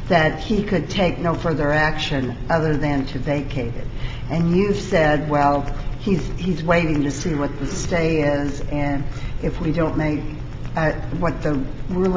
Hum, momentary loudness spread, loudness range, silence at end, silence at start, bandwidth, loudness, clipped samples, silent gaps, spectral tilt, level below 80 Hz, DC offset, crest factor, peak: none; 9 LU; 3 LU; 0 s; 0 s; 7.8 kHz; -21 LUFS; under 0.1%; none; -6.5 dB/octave; -32 dBFS; under 0.1%; 18 dB; -2 dBFS